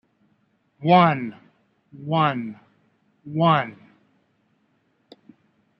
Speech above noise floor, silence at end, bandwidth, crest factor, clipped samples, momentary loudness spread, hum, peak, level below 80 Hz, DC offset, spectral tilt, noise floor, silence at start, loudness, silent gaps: 47 dB; 2.05 s; 5.6 kHz; 22 dB; under 0.1%; 19 LU; none; -4 dBFS; -70 dBFS; under 0.1%; -9.5 dB/octave; -67 dBFS; 0.8 s; -21 LUFS; none